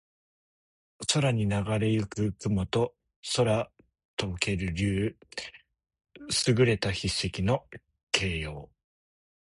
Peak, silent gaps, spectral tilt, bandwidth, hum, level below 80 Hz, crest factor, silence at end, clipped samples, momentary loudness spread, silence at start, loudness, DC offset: -6 dBFS; 3.16-3.23 s, 4.05-4.17 s, 8.03-8.07 s; -5 dB/octave; 11.5 kHz; none; -48 dBFS; 24 dB; 0.8 s; under 0.1%; 14 LU; 1 s; -28 LUFS; under 0.1%